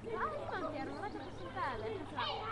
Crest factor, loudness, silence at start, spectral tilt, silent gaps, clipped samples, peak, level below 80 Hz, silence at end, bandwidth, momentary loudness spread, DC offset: 14 dB; -41 LUFS; 0 s; -5.5 dB/octave; none; under 0.1%; -26 dBFS; -58 dBFS; 0 s; 11.5 kHz; 5 LU; under 0.1%